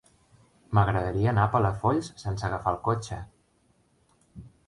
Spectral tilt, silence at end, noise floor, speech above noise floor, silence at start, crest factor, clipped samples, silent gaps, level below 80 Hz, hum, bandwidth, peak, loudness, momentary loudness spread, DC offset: -7.5 dB/octave; 0.2 s; -66 dBFS; 41 dB; 0.7 s; 20 dB; under 0.1%; none; -46 dBFS; none; 11 kHz; -8 dBFS; -27 LUFS; 11 LU; under 0.1%